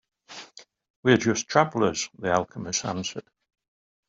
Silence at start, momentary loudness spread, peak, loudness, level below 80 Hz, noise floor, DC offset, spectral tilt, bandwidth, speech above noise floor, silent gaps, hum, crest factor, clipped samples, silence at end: 0.3 s; 21 LU; -4 dBFS; -25 LUFS; -62 dBFS; -50 dBFS; under 0.1%; -4 dB/octave; 7.8 kHz; 25 dB; 0.90-1.03 s; none; 24 dB; under 0.1%; 0.85 s